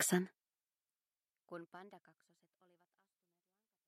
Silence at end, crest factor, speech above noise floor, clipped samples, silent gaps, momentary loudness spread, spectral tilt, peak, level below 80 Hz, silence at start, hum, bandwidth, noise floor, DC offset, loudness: 1.9 s; 26 dB; over 49 dB; under 0.1%; none; 21 LU; -4 dB/octave; -20 dBFS; under -90 dBFS; 0 s; none; 14 kHz; under -90 dBFS; under 0.1%; -41 LUFS